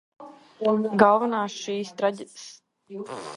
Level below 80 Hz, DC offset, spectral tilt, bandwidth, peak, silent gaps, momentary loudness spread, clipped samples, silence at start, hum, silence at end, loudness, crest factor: -72 dBFS; under 0.1%; -5 dB/octave; 11.5 kHz; -2 dBFS; none; 23 LU; under 0.1%; 0.2 s; none; 0 s; -23 LUFS; 24 dB